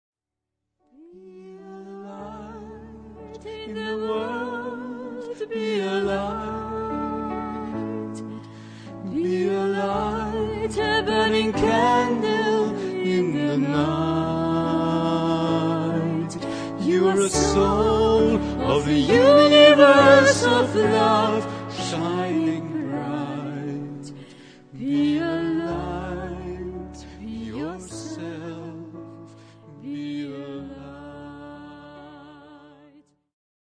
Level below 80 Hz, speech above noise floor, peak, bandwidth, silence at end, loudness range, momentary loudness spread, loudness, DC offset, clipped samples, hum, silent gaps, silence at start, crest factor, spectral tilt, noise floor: -44 dBFS; 67 dB; -2 dBFS; 10.5 kHz; 1.05 s; 21 LU; 21 LU; -21 LUFS; under 0.1%; under 0.1%; none; none; 1.15 s; 22 dB; -5 dB/octave; -85 dBFS